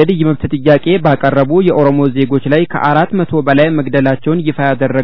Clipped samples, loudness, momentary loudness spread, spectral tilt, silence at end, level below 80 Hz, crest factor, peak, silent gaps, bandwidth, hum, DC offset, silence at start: 0.8%; -12 LUFS; 4 LU; -10 dB/octave; 0 s; -44 dBFS; 12 dB; 0 dBFS; none; 5.4 kHz; none; 4%; 0 s